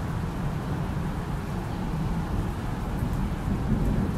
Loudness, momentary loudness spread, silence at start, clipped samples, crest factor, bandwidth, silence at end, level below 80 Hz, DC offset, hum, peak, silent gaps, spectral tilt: -30 LUFS; 5 LU; 0 s; under 0.1%; 16 dB; 14.5 kHz; 0 s; -34 dBFS; under 0.1%; none; -12 dBFS; none; -7.5 dB/octave